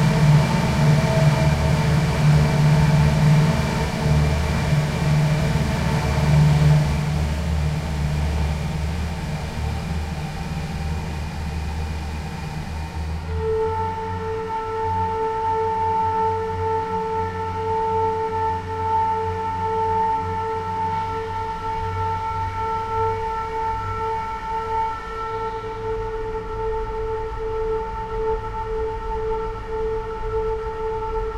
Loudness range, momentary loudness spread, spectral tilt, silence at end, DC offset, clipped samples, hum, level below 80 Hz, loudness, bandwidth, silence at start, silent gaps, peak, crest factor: 9 LU; 11 LU; -7 dB/octave; 0 s; under 0.1%; under 0.1%; none; -30 dBFS; -22 LUFS; 13.5 kHz; 0 s; none; -6 dBFS; 16 dB